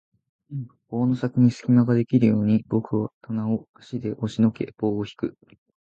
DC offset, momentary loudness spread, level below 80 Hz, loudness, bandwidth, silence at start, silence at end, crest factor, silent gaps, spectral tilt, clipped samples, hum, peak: under 0.1%; 13 LU; -58 dBFS; -23 LUFS; 7.6 kHz; 0.5 s; 0.65 s; 18 dB; 3.13-3.21 s, 3.69-3.74 s; -9 dB/octave; under 0.1%; none; -6 dBFS